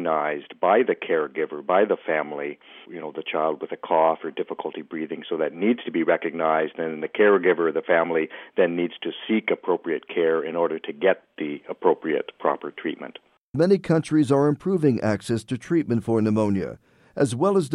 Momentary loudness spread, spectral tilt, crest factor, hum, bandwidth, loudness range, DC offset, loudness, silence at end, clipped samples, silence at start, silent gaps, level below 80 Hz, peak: 12 LU; -7 dB/octave; 18 dB; none; 11.5 kHz; 4 LU; under 0.1%; -24 LUFS; 0 s; under 0.1%; 0 s; 13.38-13.54 s; -64 dBFS; -6 dBFS